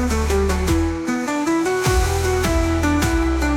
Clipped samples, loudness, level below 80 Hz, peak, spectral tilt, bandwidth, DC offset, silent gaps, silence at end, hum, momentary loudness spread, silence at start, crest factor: under 0.1%; -19 LUFS; -24 dBFS; -6 dBFS; -5.5 dB/octave; 17.5 kHz; under 0.1%; none; 0 s; none; 3 LU; 0 s; 12 dB